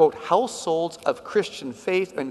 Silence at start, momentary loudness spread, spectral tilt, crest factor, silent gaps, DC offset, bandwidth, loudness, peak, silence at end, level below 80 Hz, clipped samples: 0 s; 6 LU; -4.5 dB/octave; 18 dB; none; under 0.1%; 12 kHz; -25 LUFS; -6 dBFS; 0 s; -66 dBFS; under 0.1%